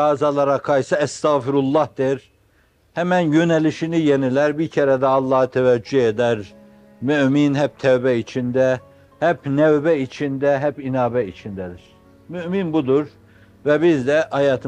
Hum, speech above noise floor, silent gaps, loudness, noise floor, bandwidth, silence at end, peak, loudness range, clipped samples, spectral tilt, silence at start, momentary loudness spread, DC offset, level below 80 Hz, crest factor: none; 40 dB; none; -19 LUFS; -58 dBFS; 9.8 kHz; 0 s; -4 dBFS; 4 LU; under 0.1%; -7 dB/octave; 0 s; 10 LU; under 0.1%; -58 dBFS; 14 dB